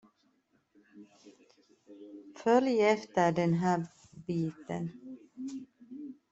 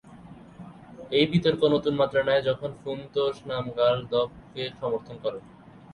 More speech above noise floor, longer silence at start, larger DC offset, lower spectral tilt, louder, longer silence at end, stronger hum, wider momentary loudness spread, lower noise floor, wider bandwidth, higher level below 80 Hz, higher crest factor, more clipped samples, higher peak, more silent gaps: first, 42 dB vs 21 dB; first, 0.95 s vs 0.05 s; neither; about the same, -7 dB/octave vs -7 dB/octave; second, -31 LUFS vs -26 LUFS; second, 0.2 s vs 0.45 s; neither; about the same, 22 LU vs 20 LU; first, -73 dBFS vs -47 dBFS; second, 8 kHz vs 10.5 kHz; second, -74 dBFS vs -58 dBFS; about the same, 20 dB vs 20 dB; neither; second, -12 dBFS vs -8 dBFS; neither